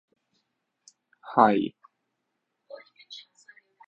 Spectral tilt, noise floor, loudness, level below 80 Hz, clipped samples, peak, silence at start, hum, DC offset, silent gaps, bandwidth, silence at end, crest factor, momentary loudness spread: -6.5 dB/octave; -80 dBFS; -24 LUFS; -70 dBFS; under 0.1%; -4 dBFS; 1.25 s; none; under 0.1%; none; 8 kHz; 0.7 s; 28 dB; 27 LU